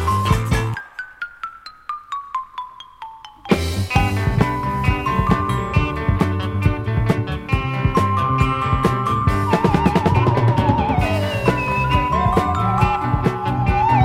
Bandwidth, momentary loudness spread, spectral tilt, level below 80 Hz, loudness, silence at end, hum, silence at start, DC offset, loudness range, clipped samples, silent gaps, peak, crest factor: 15.5 kHz; 15 LU; -7 dB/octave; -30 dBFS; -19 LUFS; 0 s; none; 0 s; under 0.1%; 7 LU; under 0.1%; none; 0 dBFS; 18 dB